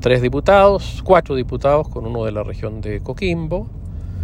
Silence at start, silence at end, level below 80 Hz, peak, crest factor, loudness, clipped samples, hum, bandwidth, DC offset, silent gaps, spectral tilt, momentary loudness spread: 0 s; 0 s; -30 dBFS; 0 dBFS; 16 dB; -18 LUFS; under 0.1%; none; 10.5 kHz; under 0.1%; none; -7 dB/octave; 14 LU